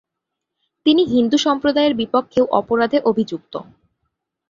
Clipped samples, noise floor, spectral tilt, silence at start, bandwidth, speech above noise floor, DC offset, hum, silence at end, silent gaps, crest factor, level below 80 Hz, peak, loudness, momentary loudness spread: under 0.1%; -81 dBFS; -5 dB/octave; 0.85 s; 7.6 kHz; 64 dB; under 0.1%; none; 0.9 s; none; 18 dB; -56 dBFS; -2 dBFS; -17 LUFS; 10 LU